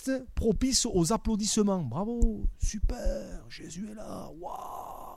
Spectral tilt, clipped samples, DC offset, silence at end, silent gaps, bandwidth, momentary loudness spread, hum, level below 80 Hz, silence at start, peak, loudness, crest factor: -4.5 dB/octave; under 0.1%; under 0.1%; 0 s; none; 15 kHz; 16 LU; none; -34 dBFS; 0 s; -12 dBFS; -30 LUFS; 18 dB